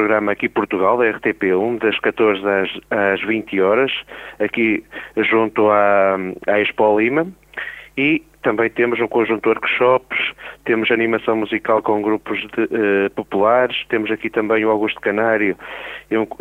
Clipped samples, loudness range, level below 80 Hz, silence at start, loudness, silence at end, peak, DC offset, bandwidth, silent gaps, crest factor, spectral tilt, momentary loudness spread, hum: under 0.1%; 2 LU; -56 dBFS; 0 s; -18 LUFS; 0.05 s; -2 dBFS; under 0.1%; 4.2 kHz; none; 16 dB; -7 dB/octave; 8 LU; none